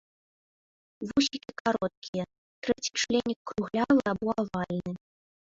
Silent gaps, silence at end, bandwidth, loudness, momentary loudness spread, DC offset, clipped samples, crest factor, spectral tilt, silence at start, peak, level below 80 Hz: 1.60-1.65 s, 1.97-2.02 s, 2.08-2.13 s, 2.38-2.62 s, 3.36-3.45 s; 0.6 s; 7.8 kHz; -30 LUFS; 12 LU; under 0.1%; under 0.1%; 20 dB; -4.5 dB/octave; 1 s; -10 dBFS; -60 dBFS